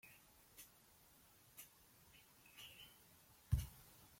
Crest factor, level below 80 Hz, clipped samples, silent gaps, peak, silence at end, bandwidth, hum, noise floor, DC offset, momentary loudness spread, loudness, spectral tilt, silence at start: 28 dB; -56 dBFS; under 0.1%; none; -26 dBFS; 0 s; 16.5 kHz; none; -70 dBFS; under 0.1%; 23 LU; -52 LUFS; -4.5 dB/octave; 0.05 s